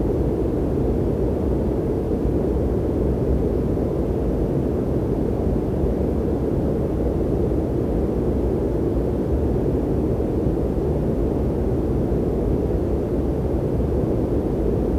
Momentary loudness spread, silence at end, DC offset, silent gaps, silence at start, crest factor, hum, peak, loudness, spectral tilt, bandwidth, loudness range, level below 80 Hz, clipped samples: 1 LU; 0 s; under 0.1%; none; 0 s; 12 dB; none; -10 dBFS; -22 LUFS; -10 dB/octave; 13.5 kHz; 0 LU; -28 dBFS; under 0.1%